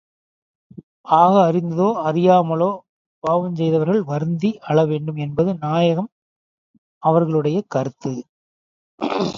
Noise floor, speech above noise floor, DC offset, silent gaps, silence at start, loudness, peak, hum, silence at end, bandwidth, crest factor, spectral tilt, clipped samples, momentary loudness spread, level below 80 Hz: under -90 dBFS; over 72 dB; under 0.1%; 2.89-3.22 s, 6.12-7.01 s, 8.29-8.98 s; 1.05 s; -19 LUFS; 0 dBFS; none; 0 s; 7.2 kHz; 20 dB; -8 dB/octave; under 0.1%; 13 LU; -60 dBFS